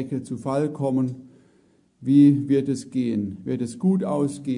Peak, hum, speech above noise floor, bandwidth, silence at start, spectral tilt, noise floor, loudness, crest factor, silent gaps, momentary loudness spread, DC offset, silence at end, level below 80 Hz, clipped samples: -6 dBFS; none; 38 dB; 10.5 kHz; 0 s; -8 dB/octave; -60 dBFS; -23 LUFS; 16 dB; none; 13 LU; under 0.1%; 0 s; -66 dBFS; under 0.1%